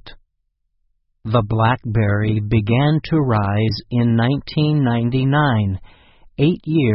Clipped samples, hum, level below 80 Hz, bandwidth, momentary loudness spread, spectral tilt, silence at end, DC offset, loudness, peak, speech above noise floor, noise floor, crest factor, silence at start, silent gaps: under 0.1%; none; -40 dBFS; 5.8 kHz; 4 LU; -11.5 dB/octave; 0 s; under 0.1%; -18 LUFS; -2 dBFS; 53 dB; -70 dBFS; 16 dB; 0.05 s; none